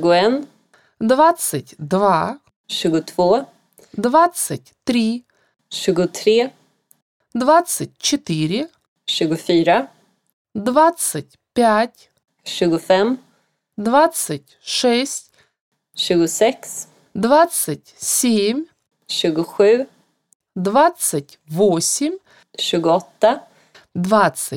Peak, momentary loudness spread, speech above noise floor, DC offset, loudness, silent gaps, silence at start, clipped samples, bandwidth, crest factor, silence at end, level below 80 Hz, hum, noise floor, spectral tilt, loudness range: -2 dBFS; 15 LU; 46 dB; under 0.1%; -18 LUFS; 2.56-2.64 s, 7.02-7.20 s, 8.88-8.96 s, 10.33-10.45 s, 15.61-15.72 s, 20.35-20.40 s; 0 s; under 0.1%; 18 kHz; 16 dB; 0 s; -62 dBFS; none; -63 dBFS; -4 dB/octave; 2 LU